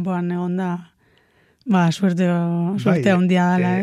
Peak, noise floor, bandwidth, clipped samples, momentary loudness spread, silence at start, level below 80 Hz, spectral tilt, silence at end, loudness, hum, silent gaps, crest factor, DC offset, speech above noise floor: -4 dBFS; -58 dBFS; 10 kHz; under 0.1%; 8 LU; 0 s; -64 dBFS; -7.5 dB/octave; 0 s; -19 LUFS; none; none; 16 dB; under 0.1%; 40 dB